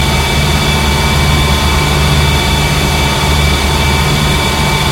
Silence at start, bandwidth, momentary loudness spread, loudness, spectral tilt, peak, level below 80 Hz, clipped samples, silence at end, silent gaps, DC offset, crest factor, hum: 0 s; 16.5 kHz; 1 LU; -11 LUFS; -4 dB/octave; 0 dBFS; -16 dBFS; under 0.1%; 0 s; none; under 0.1%; 10 dB; none